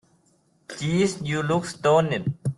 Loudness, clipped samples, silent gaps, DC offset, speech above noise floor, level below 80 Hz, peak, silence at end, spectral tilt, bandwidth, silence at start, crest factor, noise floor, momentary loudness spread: -24 LUFS; under 0.1%; none; under 0.1%; 41 dB; -60 dBFS; -8 dBFS; 0.05 s; -6 dB/octave; 12 kHz; 0.7 s; 16 dB; -64 dBFS; 8 LU